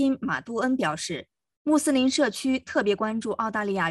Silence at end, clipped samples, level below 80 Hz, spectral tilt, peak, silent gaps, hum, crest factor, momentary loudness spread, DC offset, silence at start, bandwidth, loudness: 0 s; under 0.1%; -62 dBFS; -4 dB/octave; -10 dBFS; 1.57-1.65 s; none; 14 dB; 8 LU; under 0.1%; 0 s; 12.5 kHz; -26 LUFS